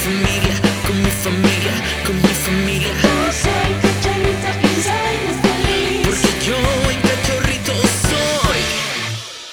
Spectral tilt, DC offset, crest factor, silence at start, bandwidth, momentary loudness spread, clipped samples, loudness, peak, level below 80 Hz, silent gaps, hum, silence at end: -4 dB/octave; under 0.1%; 16 dB; 0 s; over 20 kHz; 3 LU; under 0.1%; -16 LUFS; 0 dBFS; -28 dBFS; none; none; 0 s